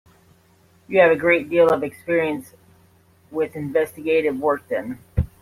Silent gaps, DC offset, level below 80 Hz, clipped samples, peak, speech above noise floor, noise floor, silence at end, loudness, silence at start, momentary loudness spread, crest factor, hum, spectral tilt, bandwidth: none; under 0.1%; -42 dBFS; under 0.1%; -2 dBFS; 36 dB; -56 dBFS; 0.15 s; -20 LUFS; 0.9 s; 12 LU; 20 dB; none; -7 dB/octave; 15 kHz